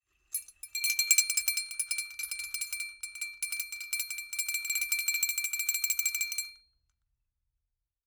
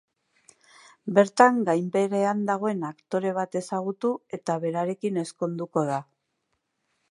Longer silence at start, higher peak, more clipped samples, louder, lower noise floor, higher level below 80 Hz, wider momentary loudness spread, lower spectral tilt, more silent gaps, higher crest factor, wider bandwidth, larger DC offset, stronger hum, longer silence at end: second, 0.3 s vs 1.05 s; second, -8 dBFS vs -2 dBFS; neither; second, -30 LUFS vs -26 LUFS; first, -85 dBFS vs -77 dBFS; first, -74 dBFS vs -80 dBFS; about the same, 13 LU vs 12 LU; second, 6.5 dB/octave vs -6 dB/octave; neither; about the same, 28 dB vs 24 dB; first, over 20 kHz vs 11.5 kHz; neither; neither; first, 1.5 s vs 1.1 s